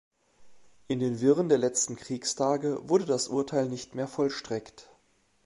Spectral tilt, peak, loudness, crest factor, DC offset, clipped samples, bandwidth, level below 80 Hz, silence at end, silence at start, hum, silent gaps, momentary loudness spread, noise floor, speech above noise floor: -4.5 dB/octave; -10 dBFS; -28 LUFS; 18 dB; under 0.1%; under 0.1%; 11.5 kHz; -68 dBFS; 0.65 s; 0.4 s; none; none; 10 LU; -68 dBFS; 40 dB